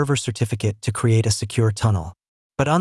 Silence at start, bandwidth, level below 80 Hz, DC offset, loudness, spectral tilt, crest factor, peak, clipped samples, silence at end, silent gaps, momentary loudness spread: 0 s; 12 kHz; -48 dBFS; under 0.1%; -21 LUFS; -5.5 dB/octave; 16 dB; -4 dBFS; under 0.1%; 0 s; 2.28-2.50 s; 7 LU